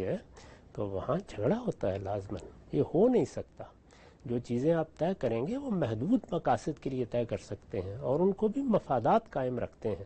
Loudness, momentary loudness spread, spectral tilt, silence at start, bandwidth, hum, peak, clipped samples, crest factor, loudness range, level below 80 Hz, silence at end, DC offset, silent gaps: -32 LUFS; 12 LU; -8 dB/octave; 0 s; 8.4 kHz; none; -14 dBFS; under 0.1%; 16 dB; 2 LU; -58 dBFS; 0 s; under 0.1%; none